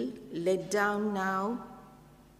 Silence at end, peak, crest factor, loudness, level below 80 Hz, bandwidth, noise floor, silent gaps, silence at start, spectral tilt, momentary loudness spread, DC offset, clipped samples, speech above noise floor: 0.3 s; -14 dBFS; 18 dB; -31 LUFS; -64 dBFS; 15.5 kHz; -56 dBFS; none; 0 s; -5 dB/octave; 14 LU; under 0.1%; under 0.1%; 26 dB